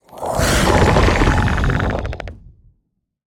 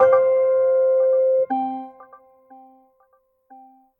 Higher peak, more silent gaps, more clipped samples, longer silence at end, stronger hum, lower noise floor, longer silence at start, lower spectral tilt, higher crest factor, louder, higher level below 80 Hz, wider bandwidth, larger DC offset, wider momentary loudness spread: first, 0 dBFS vs -4 dBFS; neither; neither; second, 0.9 s vs 1.95 s; neither; first, -68 dBFS vs -62 dBFS; first, 0.15 s vs 0 s; second, -5 dB/octave vs -8 dB/octave; about the same, 16 dB vs 16 dB; about the same, -16 LUFS vs -18 LUFS; first, -24 dBFS vs -72 dBFS; first, 18 kHz vs 3.3 kHz; neither; about the same, 14 LU vs 13 LU